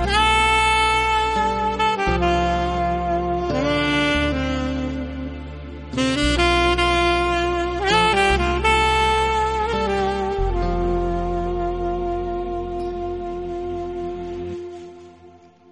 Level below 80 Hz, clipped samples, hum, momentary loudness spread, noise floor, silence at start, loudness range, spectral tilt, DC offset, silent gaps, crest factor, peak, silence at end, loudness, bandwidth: -30 dBFS; under 0.1%; none; 13 LU; -47 dBFS; 0 s; 8 LU; -4.5 dB/octave; under 0.1%; none; 16 dB; -4 dBFS; 0.4 s; -20 LUFS; 11.5 kHz